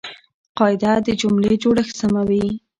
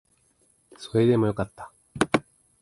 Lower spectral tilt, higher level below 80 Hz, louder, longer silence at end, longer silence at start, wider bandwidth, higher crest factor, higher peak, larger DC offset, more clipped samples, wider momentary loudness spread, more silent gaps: about the same, -6 dB/octave vs -6.5 dB/octave; first, -48 dBFS vs -54 dBFS; first, -18 LUFS vs -25 LUFS; second, 0.2 s vs 0.4 s; second, 0.05 s vs 0.8 s; second, 9.2 kHz vs 11.5 kHz; second, 16 dB vs 24 dB; about the same, -2 dBFS vs -4 dBFS; neither; neither; second, 4 LU vs 22 LU; first, 0.34-0.55 s vs none